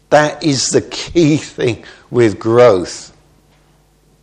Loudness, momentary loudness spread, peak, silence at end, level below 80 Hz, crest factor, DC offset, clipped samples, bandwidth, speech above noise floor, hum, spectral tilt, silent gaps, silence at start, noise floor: -13 LUFS; 11 LU; 0 dBFS; 1.15 s; -46 dBFS; 14 dB; under 0.1%; 0.1%; 10 kHz; 39 dB; none; -5 dB/octave; none; 0.1 s; -52 dBFS